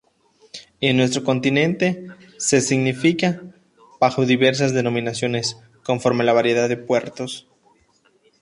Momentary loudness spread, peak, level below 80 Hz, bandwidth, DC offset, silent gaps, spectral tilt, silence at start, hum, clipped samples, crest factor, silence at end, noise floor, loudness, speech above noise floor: 15 LU; -2 dBFS; -60 dBFS; 11.5 kHz; under 0.1%; none; -4.5 dB/octave; 0.55 s; none; under 0.1%; 18 dB; 1 s; -60 dBFS; -20 LUFS; 41 dB